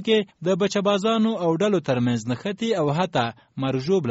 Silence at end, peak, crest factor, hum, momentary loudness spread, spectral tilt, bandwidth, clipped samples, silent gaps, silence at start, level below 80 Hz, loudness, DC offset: 0 s; -8 dBFS; 14 dB; none; 5 LU; -5 dB/octave; 8 kHz; under 0.1%; none; 0 s; -62 dBFS; -23 LUFS; under 0.1%